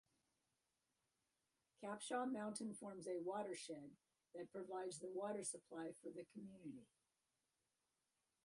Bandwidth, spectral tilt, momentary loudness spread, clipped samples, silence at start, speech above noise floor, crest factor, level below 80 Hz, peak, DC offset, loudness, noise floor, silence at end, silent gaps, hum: 11.5 kHz; -4 dB/octave; 12 LU; under 0.1%; 1.8 s; over 40 dB; 20 dB; under -90 dBFS; -32 dBFS; under 0.1%; -50 LUFS; under -90 dBFS; 1.6 s; none; none